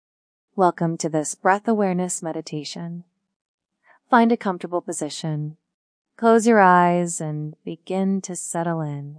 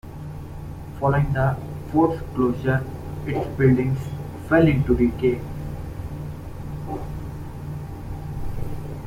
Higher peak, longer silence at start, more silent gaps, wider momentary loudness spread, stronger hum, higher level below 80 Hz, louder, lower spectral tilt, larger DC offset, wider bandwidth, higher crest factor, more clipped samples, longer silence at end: about the same, -2 dBFS vs -4 dBFS; first, 0.55 s vs 0.05 s; first, 3.36-3.58 s, 5.74-6.05 s vs none; about the same, 16 LU vs 16 LU; neither; second, -78 dBFS vs -36 dBFS; first, -21 LUFS vs -24 LUFS; second, -5.5 dB/octave vs -9 dB/octave; neither; second, 10.5 kHz vs 16 kHz; about the same, 20 dB vs 18 dB; neither; about the same, 0 s vs 0 s